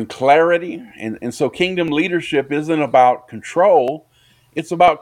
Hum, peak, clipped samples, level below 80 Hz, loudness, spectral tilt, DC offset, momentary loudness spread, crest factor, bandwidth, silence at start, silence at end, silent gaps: none; 0 dBFS; under 0.1%; -58 dBFS; -16 LUFS; -5.5 dB/octave; under 0.1%; 15 LU; 16 dB; 12.5 kHz; 0 s; 0.05 s; none